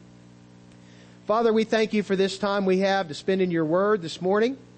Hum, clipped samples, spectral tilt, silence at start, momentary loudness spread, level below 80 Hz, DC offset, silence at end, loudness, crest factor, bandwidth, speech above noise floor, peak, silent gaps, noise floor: 60 Hz at -50 dBFS; under 0.1%; -6 dB/octave; 1.3 s; 4 LU; -66 dBFS; under 0.1%; 0.2 s; -24 LUFS; 14 dB; 8.8 kHz; 27 dB; -10 dBFS; none; -50 dBFS